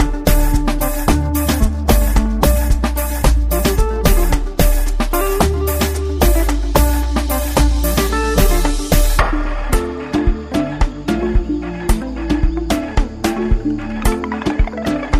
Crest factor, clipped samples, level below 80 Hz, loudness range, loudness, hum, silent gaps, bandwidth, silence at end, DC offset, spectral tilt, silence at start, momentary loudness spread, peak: 14 dB; under 0.1%; -16 dBFS; 3 LU; -17 LUFS; none; none; 15.5 kHz; 0 s; 0.2%; -5.5 dB/octave; 0 s; 5 LU; 0 dBFS